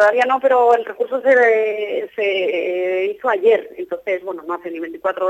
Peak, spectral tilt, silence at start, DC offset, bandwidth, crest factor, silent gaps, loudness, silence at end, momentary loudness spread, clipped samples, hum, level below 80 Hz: -2 dBFS; -4 dB/octave; 0 s; under 0.1%; 13.5 kHz; 14 dB; none; -18 LUFS; 0 s; 13 LU; under 0.1%; none; -68 dBFS